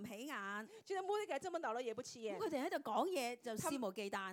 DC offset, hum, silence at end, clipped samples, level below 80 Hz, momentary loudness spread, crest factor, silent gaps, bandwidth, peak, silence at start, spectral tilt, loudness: under 0.1%; none; 0 s; under 0.1%; -86 dBFS; 7 LU; 18 dB; none; 17.5 kHz; -26 dBFS; 0 s; -3.5 dB/octave; -43 LUFS